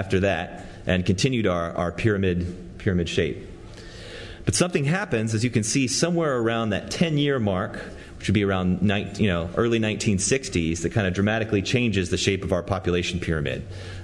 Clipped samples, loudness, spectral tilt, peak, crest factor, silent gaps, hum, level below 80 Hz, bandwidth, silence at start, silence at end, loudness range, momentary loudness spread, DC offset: under 0.1%; -24 LUFS; -5 dB/octave; -4 dBFS; 20 dB; none; none; -46 dBFS; 12 kHz; 0 s; 0 s; 3 LU; 11 LU; under 0.1%